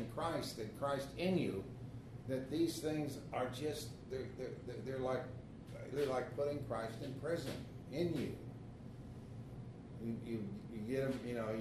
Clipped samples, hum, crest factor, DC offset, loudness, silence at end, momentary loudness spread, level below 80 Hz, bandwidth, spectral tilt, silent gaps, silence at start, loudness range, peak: under 0.1%; none; 18 dB; under 0.1%; -42 LUFS; 0 s; 13 LU; -62 dBFS; 13.5 kHz; -6 dB/octave; none; 0 s; 4 LU; -24 dBFS